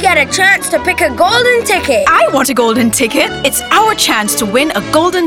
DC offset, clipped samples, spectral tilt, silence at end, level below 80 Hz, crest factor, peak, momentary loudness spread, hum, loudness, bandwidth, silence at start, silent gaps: under 0.1%; under 0.1%; -2.5 dB/octave; 0 s; -40 dBFS; 10 dB; 0 dBFS; 4 LU; none; -10 LUFS; 18.5 kHz; 0 s; none